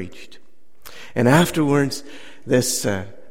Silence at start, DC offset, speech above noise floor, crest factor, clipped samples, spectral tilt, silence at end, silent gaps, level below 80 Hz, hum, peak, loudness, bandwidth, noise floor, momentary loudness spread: 0 s; 2%; 29 dB; 20 dB; under 0.1%; -5 dB/octave; 0.2 s; none; -52 dBFS; none; -2 dBFS; -19 LUFS; 16.5 kHz; -49 dBFS; 22 LU